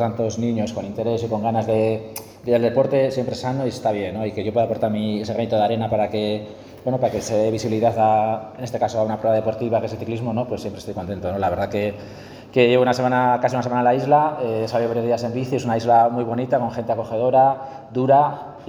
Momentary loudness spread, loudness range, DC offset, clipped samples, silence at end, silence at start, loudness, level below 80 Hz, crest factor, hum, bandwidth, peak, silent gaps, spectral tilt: 11 LU; 4 LU; under 0.1%; under 0.1%; 0 s; 0 s; -21 LUFS; -54 dBFS; 18 dB; none; 19.5 kHz; -2 dBFS; none; -6.5 dB/octave